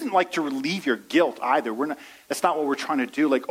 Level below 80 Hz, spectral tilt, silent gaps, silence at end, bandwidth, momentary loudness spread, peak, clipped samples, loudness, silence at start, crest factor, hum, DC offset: -74 dBFS; -4 dB/octave; none; 0 s; 16 kHz; 7 LU; -6 dBFS; under 0.1%; -24 LUFS; 0 s; 18 dB; none; under 0.1%